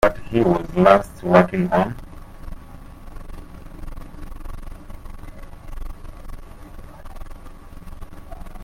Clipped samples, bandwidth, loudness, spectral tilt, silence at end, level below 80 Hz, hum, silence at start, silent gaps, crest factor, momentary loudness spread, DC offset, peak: under 0.1%; 16 kHz; -18 LUFS; -7.5 dB/octave; 0 s; -36 dBFS; none; 0 s; none; 22 dB; 27 LU; under 0.1%; 0 dBFS